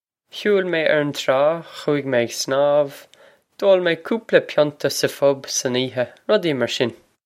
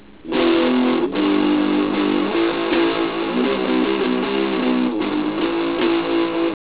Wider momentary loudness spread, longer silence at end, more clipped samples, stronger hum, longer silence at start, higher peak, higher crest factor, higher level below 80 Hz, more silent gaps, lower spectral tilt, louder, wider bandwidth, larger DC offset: first, 7 LU vs 4 LU; about the same, 0.3 s vs 0.2 s; neither; neither; about the same, 0.35 s vs 0.25 s; first, 0 dBFS vs -4 dBFS; first, 20 dB vs 14 dB; second, -70 dBFS vs -52 dBFS; neither; second, -4 dB/octave vs -9.5 dB/octave; about the same, -20 LUFS vs -19 LUFS; first, 15.5 kHz vs 4 kHz; second, under 0.1% vs 0.5%